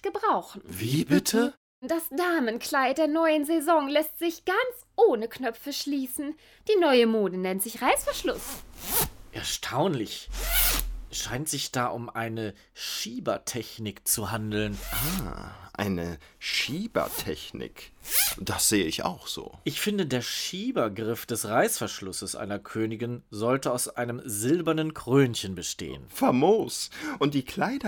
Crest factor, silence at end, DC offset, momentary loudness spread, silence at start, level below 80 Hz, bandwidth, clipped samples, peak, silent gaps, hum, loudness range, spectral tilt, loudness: 22 dB; 0 s; under 0.1%; 12 LU; 0.05 s; -46 dBFS; over 20 kHz; under 0.1%; -6 dBFS; 1.57-1.82 s; none; 5 LU; -4 dB/octave; -27 LUFS